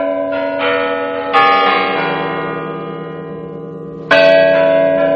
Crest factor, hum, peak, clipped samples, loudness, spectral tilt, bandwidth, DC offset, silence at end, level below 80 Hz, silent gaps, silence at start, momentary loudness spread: 14 dB; none; 0 dBFS; under 0.1%; -13 LUFS; -6 dB/octave; 7 kHz; under 0.1%; 0 s; -54 dBFS; none; 0 s; 18 LU